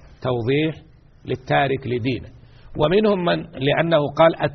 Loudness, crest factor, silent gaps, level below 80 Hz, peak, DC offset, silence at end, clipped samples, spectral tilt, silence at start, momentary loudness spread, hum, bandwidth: -20 LUFS; 18 dB; none; -46 dBFS; -4 dBFS; under 0.1%; 0 s; under 0.1%; -4.5 dB/octave; 0.2 s; 13 LU; none; 6.4 kHz